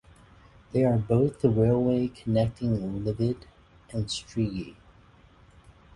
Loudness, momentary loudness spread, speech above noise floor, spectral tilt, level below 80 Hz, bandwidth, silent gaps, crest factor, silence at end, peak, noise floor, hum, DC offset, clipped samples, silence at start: -27 LUFS; 11 LU; 30 dB; -7.5 dB/octave; -50 dBFS; 11 kHz; none; 20 dB; 1.25 s; -8 dBFS; -56 dBFS; none; under 0.1%; under 0.1%; 0.75 s